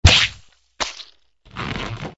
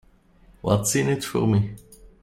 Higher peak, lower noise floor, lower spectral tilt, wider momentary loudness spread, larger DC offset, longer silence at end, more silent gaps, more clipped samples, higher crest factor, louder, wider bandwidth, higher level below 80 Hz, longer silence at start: first, 0 dBFS vs -6 dBFS; second, -51 dBFS vs -55 dBFS; second, -3 dB/octave vs -5.5 dB/octave; first, 23 LU vs 11 LU; neither; about the same, 0.05 s vs 0.15 s; neither; neither; about the same, 22 dB vs 18 dB; about the same, -21 LUFS vs -23 LUFS; second, 8 kHz vs 16 kHz; first, -28 dBFS vs -50 dBFS; second, 0.05 s vs 0.65 s